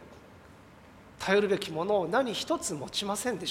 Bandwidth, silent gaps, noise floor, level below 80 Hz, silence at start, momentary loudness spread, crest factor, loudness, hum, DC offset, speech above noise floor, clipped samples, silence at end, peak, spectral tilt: 16 kHz; none; -53 dBFS; -62 dBFS; 0 s; 6 LU; 20 dB; -29 LUFS; none; under 0.1%; 24 dB; under 0.1%; 0 s; -12 dBFS; -3.5 dB/octave